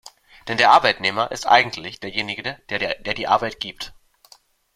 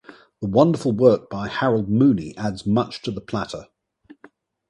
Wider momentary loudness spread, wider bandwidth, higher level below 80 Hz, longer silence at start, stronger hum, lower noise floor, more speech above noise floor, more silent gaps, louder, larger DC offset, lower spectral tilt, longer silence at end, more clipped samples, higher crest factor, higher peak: first, 16 LU vs 12 LU; first, 15 kHz vs 11 kHz; about the same, -54 dBFS vs -52 dBFS; second, 0.05 s vs 0.4 s; neither; about the same, -54 dBFS vs -53 dBFS; about the same, 33 dB vs 33 dB; neither; about the same, -20 LUFS vs -21 LUFS; neither; second, -3 dB/octave vs -7.5 dB/octave; second, 0.85 s vs 1.05 s; neither; about the same, 22 dB vs 20 dB; about the same, 0 dBFS vs -2 dBFS